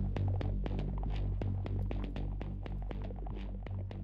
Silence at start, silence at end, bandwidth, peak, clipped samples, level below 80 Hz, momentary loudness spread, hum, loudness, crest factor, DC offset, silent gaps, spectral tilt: 0 s; 0 s; 5.4 kHz; -22 dBFS; under 0.1%; -40 dBFS; 7 LU; none; -39 LUFS; 14 dB; under 0.1%; none; -9.5 dB/octave